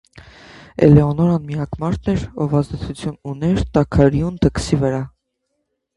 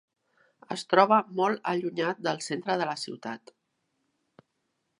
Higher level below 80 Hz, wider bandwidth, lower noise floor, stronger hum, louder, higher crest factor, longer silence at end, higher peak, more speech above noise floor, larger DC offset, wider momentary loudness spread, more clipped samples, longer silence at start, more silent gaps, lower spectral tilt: first, -34 dBFS vs -84 dBFS; about the same, 11.5 kHz vs 11 kHz; second, -73 dBFS vs -78 dBFS; neither; first, -18 LUFS vs -27 LUFS; second, 18 dB vs 26 dB; second, 0.9 s vs 1.65 s; first, 0 dBFS vs -4 dBFS; first, 56 dB vs 51 dB; neither; about the same, 14 LU vs 16 LU; neither; second, 0.15 s vs 0.7 s; neither; first, -8 dB/octave vs -4.5 dB/octave